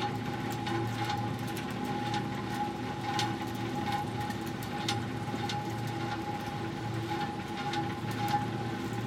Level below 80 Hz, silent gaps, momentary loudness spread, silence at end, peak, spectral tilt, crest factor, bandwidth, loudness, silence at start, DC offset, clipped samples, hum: -58 dBFS; none; 4 LU; 0 s; -16 dBFS; -5.5 dB/octave; 18 dB; 16.5 kHz; -34 LUFS; 0 s; under 0.1%; under 0.1%; none